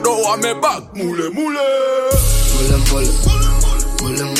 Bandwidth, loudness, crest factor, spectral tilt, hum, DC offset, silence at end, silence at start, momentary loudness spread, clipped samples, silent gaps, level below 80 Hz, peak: 16 kHz; -16 LUFS; 12 dB; -4 dB/octave; none; under 0.1%; 0 s; 0 s; 5 LU; under 0.1%; none; -16 dBFS; -2 dBFS